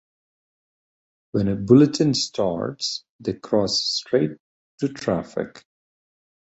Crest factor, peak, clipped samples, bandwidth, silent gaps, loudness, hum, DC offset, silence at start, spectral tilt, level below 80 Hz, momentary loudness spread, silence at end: 22 dB; -2 dBFS; under 0.1%; 8.2 kHz; 3.09-3.19 s, 4.40-4.78 s; -22 LUFS; none; under 0.1%; 1.35 s; -5.5 dB/octave; -54 dBFS; 15 LU; 1.1 s